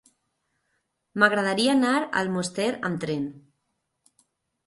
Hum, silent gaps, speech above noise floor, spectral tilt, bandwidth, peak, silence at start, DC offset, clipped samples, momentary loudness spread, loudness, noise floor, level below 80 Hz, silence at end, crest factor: none; none; 53 dB; -4.5 dB/octave; 11.5 kHz; -6 dBFS; 1.15 s; under 0.1%; under 0.1%; 10 LU; -24 LUFS; -77 dBFS; -68 dBFS; 1.25 s; 22 dB